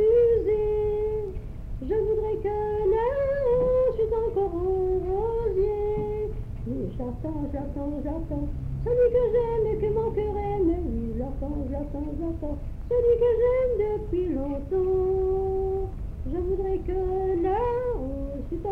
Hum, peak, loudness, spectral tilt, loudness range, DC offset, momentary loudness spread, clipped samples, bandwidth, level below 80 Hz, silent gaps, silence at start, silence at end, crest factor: none; -12 dBFS; -27 LUFS; -10 dB/octave; 4 LU; under 0.1%; 11 LU; under 0.1%; 4.7 kHz; -36 dBFS; none; 0 s; 0 s; 14 dB